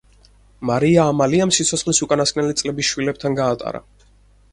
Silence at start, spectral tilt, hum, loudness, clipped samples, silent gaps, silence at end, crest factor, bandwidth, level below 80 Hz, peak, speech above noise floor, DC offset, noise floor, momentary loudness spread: 0.6 s; -4 dB/octave; 50 Hz at -45 dBFS; -18 LUFS; under 0.1%; none; 0.7 s; 18 dB; 11.5 kHz; -48 dBFS; 0 dBFS; 34 dB; under 0.1%; -52 dBFS; 10 LU